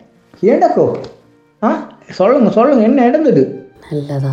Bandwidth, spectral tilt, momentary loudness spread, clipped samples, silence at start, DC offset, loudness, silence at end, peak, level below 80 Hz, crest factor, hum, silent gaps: 7.6 kHz; -8.5 dB/octave; 15 LU; under 0.1%; 0.4 s; under 0.1%; -13 LUFS; 0 s; 0 dBFS; -58 dBFS; 14 dB; none; none